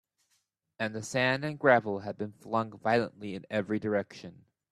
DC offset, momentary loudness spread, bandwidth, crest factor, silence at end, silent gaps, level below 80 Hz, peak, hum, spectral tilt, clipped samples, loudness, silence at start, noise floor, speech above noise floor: under 0.1%; 15 LU; 13.5 kHz; 22 dB; 0.4 s; none; -72 dBFS; -8 dBFS; none; -5.5 dB/octave; under 0.1%; -30 LUFS; 0.8 s; -76 dBFS; 46 dB